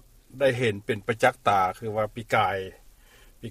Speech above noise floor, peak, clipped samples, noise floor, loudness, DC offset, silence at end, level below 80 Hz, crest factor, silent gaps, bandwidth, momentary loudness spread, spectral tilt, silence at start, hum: 28 dB; -6 dBFS; under 0.1%; -54 dBFS; -25 LUFS; under 0.1%; 0 s; -56 dBFS; 20 dB; none; 15.5 kHz; 8 LU; -5.5 dB/octave; 0.35 s; none